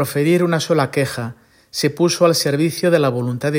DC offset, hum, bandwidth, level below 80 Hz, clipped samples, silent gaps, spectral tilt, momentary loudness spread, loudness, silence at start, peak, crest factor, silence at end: under 0.1%; none; 16.5 kHz; -60 dBFS; under 0.1%; none; -5 dB/octave; 8 LU; -17 LUFS; 0 s; -2 dBFS; 16 dB; 0 s